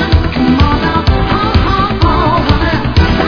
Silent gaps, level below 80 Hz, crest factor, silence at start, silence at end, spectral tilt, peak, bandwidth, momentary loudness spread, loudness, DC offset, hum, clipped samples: none; -16 dBFS; 10 dB; 0 s; 0 s; -7.5 dB/octave; 0 dBFS; 5.4 kHz; 2 LU; -11 LUFS; under 0.1%; none; 0.4%